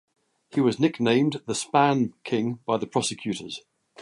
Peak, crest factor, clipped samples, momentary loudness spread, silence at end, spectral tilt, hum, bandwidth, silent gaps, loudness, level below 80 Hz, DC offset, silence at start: -6 dBFS; 20 dB; under 0.1%; 10 LU; 0 s; -5 dB/octave; none; 11.5 kHz; none; -25 LUFS; -66 dBFS; under 0.1%; 0.55 s